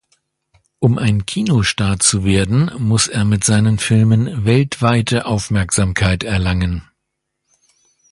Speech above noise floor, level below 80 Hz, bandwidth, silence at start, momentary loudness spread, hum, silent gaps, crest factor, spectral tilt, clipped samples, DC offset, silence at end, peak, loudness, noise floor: 60 dB; -32 dBFS; 11.5 kHz; 0.8 s; 5 LU; none; none; 16 dB; -5 dB/octave; under 0.1%; under 0.1%; 1.3 s; 0 dBFS; -16 LUFS; -75 dBFS